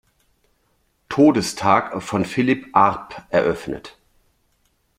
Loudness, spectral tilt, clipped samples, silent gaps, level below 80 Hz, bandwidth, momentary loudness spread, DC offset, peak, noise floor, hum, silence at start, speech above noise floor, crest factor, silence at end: -19 LUFS; -5.5 dB/octave; under 0.1%; none; -54 dBFS; 15 kHz; 13 LU; under 0.1%; -2 dBFS; -65 dBFS; none; 1.1 s; 47 dB; 20 dB; 1.1 s